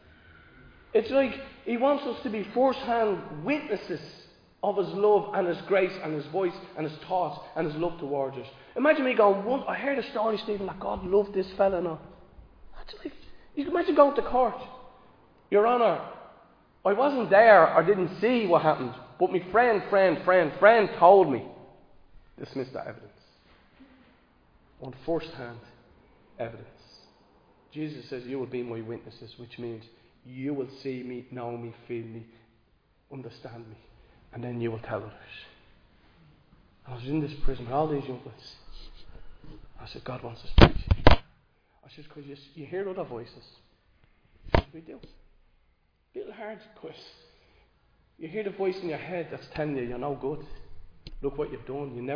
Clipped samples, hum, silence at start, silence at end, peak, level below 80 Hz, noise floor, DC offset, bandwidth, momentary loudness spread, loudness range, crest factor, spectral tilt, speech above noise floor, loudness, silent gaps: under 0.1%; none; 0.95 s; 0 s; 0 dBFS; -40 dBFS; -68 dBFS; under 0.1%; 5.4 kHz; 24 LU; 17 LU; 28 dB; -8 dB/octave; 41 dB; -26 LUFS; none